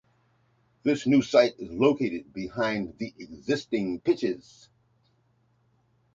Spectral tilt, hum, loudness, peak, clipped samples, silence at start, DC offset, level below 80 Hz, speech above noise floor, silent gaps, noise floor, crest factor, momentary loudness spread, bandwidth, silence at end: -6 dB/octave; none; -27 LUFS; -6 dBFS; under 0.1%; 0.85 s; under 0.1%; -62 dBFS; 41 dB; none; -68 dBFS; 22 dB; 14 LU; 7.6 kHz; 1.75 s